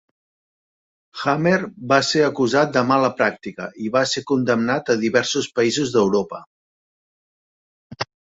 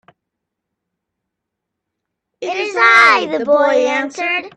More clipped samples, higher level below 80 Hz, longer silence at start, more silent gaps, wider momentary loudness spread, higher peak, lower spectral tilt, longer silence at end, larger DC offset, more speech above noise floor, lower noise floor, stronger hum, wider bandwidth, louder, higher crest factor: neither; first, -62 dBFS vs -68 dBFS; second, 1.15 s vs 2.4 s; first, 6.47-7.90 s vs none; about the same, 13 LU vs 13 LU; about the same, -2 dBFS vs 0 dBFS; first, -4.5 dB/octave vs -2 dB/octave; first, 0.35 s vs 0.1 s; neither; first, over 71 dB vs 63 dB; first, under -90 dBFS vs -79 dBFS; neither; second, 8 kHz vs 11.5 kHz; second, -19 LUFS vs -12 LUFS; about the same, 18 dB vs 16 dB